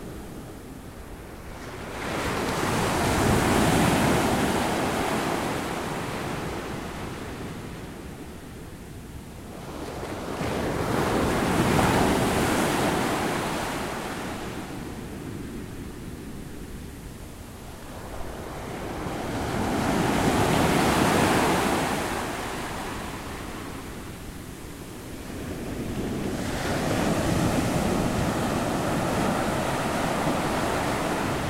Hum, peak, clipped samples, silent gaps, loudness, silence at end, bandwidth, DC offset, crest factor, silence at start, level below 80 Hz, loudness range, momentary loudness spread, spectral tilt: none; -8 dBFS; under 0.1%; none; -26 LUFS; 0 s; 16 kHz; under 0.1%; 18 dB; 0 s; -42 dBFS; 13 LU; 18 LU; -5 dB/octave